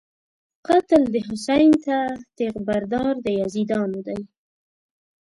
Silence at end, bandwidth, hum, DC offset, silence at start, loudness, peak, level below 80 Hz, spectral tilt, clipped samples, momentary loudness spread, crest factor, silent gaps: 0.95 s; 11.5 kHz; none; under 0.1%; 0.7 s; -21 LUFS; -4 dBFS; -54 dBFS; -6 dB/octave; under 0.1%; 12 LU; 18 dB; none